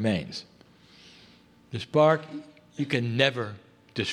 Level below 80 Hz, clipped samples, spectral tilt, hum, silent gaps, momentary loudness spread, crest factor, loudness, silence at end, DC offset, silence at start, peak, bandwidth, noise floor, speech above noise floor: -64 dBFS; under 0.1%; -6 dB/octave; none; none; 20 LU; 22 dB; -26 LUFS; 0 s; under 0.1%; 0 s; -6 dBFS; 11 kHz; -56 dBFS; 30 dB